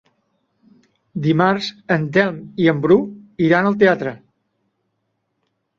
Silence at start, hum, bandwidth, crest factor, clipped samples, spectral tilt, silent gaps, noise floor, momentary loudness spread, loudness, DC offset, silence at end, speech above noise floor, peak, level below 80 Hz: 1.15 s; none; 7.4 kHz; 18 dB; under 0.1%; -7.5 dB/octave; none; -72 dBFS; 9 LU; -17 LUFS; under 0.1%; 1.6 s; 55 dB; -2 dBFS; -58 dBFS